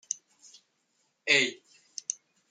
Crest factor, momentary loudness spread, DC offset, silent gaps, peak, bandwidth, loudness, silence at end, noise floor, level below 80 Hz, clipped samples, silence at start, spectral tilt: 24 dB; 17 LU; under 0.1%; none; -10 dBFS; 13 kHz; -28 LUFS; 0.35 s; -75 dBFS; -88 dBFS; under 0.1%; 0.1 s; -0.5 dB/octave